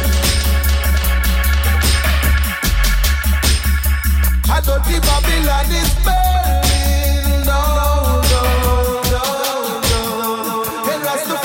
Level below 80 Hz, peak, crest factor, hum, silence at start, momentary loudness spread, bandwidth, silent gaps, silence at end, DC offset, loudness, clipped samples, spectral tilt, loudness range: -16 dBFS; -2 dBFS; 14 dB; none; 0 s; 4 LU; 17 kHz; none; 0 s; under 0.1%; -16 LUFS; under 0.1%; -4 dB/octave; 1 LU